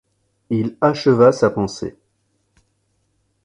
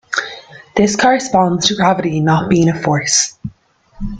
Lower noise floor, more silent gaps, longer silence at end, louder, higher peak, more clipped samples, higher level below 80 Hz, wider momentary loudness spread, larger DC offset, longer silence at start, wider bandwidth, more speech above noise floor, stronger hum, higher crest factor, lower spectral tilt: first, -67 dBFS vs -49 dBFS; neither; first, 1.55 s vs 0 s; second, -17 LUFS vs -14 LUFS; about the same, 0 dBFS vs 0 dBFS; neither; second, -54 dBFS vs -38 dBFS; second, 14 LU vs 17 LU; neither; first, 0.5 s vs 0.1 s; about the same, 10.5 kHz vs 9.6 kHz; first, 51 dB vs 36 dB; neither; about the same, 20 dB vs 16 dB; first, -6.5 dB/octave vs -4 dB/octave